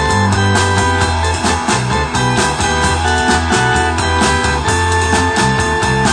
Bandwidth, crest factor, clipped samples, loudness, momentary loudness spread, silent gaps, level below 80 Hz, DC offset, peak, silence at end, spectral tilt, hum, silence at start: 10.5 kHz; 14 dB; under 0.1%; -13 LUFS; 2 LU; none; -26 dBFS; under 0.1%; 0 dBFS; 0 s; -4 dB/octave; none; 0 s